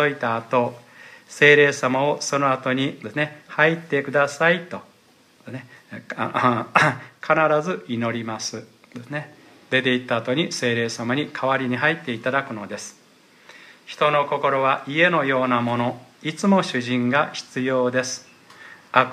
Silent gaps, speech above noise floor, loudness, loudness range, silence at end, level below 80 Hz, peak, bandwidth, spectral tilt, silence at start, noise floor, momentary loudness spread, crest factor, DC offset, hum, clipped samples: none; 34 dB; -21 LUFS; 5 LU; 0 s; -70 dBFS; 0 dBFS; 14.5 kHz; -4.5 dB/octave; 0 s; -56 dBFS; 15 LU; 22 dB; under 0.1%; none; under 0.1%